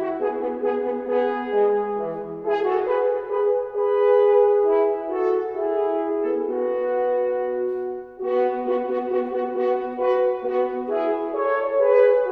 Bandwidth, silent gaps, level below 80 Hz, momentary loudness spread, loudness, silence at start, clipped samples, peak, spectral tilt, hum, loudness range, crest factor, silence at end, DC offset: 4.8 kHz; none; -62 dBFS; 8 LU; -22 LUFS; 0 s; under 0.1%; -6 dBFS; -7.5 dB/octave; none; 4 LU; 16 dB; 0 s; under 0.1%